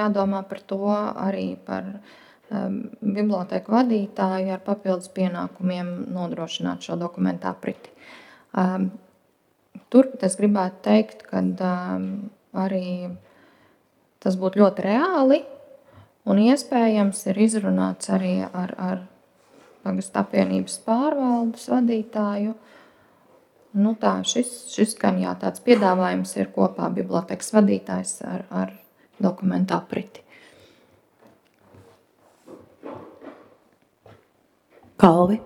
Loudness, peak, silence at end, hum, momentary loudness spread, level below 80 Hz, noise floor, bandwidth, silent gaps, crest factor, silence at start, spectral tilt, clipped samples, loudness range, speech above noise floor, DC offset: -23 LUFS; 0 dBFS; 0 s; none; 13 LU; -68 dBFS; -65 dBFS; 13.5 kHz; none; 24 dB; 0 s; -6 dB/octave; under 0.1%; 7 LU; 43 dB; under 0.1%